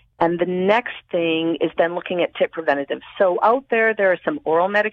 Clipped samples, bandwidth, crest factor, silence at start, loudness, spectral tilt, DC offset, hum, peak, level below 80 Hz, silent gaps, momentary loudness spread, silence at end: under 0.1%; 6.8 kHz; 16 dB; 0.2 s; -20 LUFS; -7 dB/octave; under 0.1%; none; -4 dBFS; -64 dBFS; none; 6 LU; 0 s